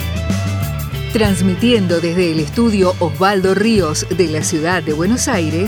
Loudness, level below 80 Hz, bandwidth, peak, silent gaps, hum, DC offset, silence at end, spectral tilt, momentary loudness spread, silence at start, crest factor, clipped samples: -15 LUFS; -32 dBFS; over 20 kHz; 0 dBFS; none; none; under 0.1%; 0 s; -5 dB/octave; 6 LU; 0 s; 14 dB; under 0.1%